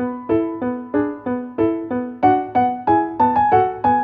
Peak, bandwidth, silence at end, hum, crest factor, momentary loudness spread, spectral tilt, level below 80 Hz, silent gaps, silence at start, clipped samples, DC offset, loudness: -4 dBFS; 4.9 kHz; 0 s; none; 16 dB; 8 LU; -10 dB/octave; -50 dBFS; none; 0 s; under 0.1%; under 0.1%; -19 LUFS